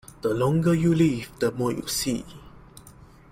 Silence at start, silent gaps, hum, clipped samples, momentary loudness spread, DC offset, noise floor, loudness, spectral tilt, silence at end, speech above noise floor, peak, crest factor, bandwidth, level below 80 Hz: 0.25 s; none; none; under 0.1%; 8 LU; under 0.1%; -49 dBFS; -24 LUFS; -6 dB/octave; 0.4 s; 26 dB; -10 dBFS; 16 dB; 16 kHz; -50 dBFS